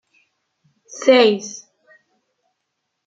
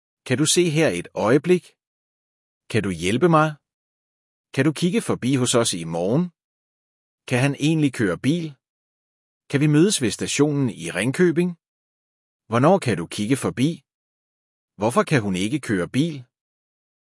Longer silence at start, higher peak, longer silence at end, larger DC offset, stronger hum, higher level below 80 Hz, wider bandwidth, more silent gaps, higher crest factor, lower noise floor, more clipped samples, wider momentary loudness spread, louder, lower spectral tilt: first, 0.95 s vs 0.25 s; first, -2 dBFS vs -6 dBFS; first, 1.5 s vs 0.95 s; neither; neither; second, -76 dBFS vs -64 dBFS; second, 7.8 kHz vs 12 kHz; second, none vs 1.87-2.61 s, 3.74-4.44 s, 6.44-7.18 s, 8.69-9.41 s, 11.68-12.40 s, 13.94-14.68 s; about the same, 20 dB vs 18 dB; second, -76 dBFS vs under -90 dBFS; neither; first, 25 LU vs 8 LU; first, -15 LUFS vs -21 LUFS; second, -3.5 dB/octave vs -5 dB/octave